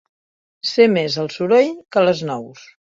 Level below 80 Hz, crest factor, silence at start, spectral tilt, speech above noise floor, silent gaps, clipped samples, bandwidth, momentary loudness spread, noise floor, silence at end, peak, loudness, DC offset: -64 dBFS; 18 dB; 0.65 s; -5.5 dB/octave; over 73 dB; none; under 0.1%; 7.6 kHz; 12 LU; under -90 dBFS; 0.45 s; 0 dBFS; -17 LUFS; under 0.1%